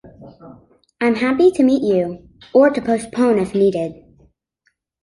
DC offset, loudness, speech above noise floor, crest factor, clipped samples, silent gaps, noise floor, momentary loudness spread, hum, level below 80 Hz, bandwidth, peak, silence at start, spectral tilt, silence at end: under 0.1%; -17 LUFS; 51 dB; 16 dB; under 0.1%; none; -67 dBFS; 11 LU; none; -54 dBFS; 11.5 kHz; -2 dBFS; 0.05 s; -6.5 dB/octave; 1.1 s